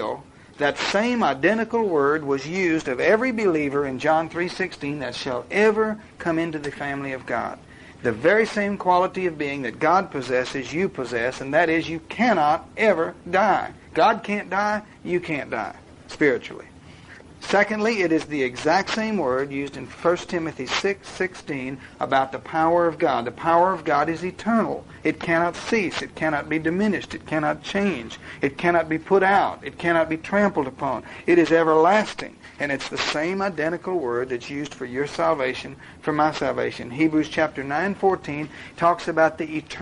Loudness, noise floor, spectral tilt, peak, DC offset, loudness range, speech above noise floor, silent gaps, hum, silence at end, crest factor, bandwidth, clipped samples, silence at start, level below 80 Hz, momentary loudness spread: -23 LUFS; -45 dBFS; -5.5 dB/octave; -6 dBFS; under 0.1%; 4 LU; 22 dB; none; none; 0 s; 18 dB; 11 kHz; under 0.1%; 0 s; -54 dBFS; 10 LU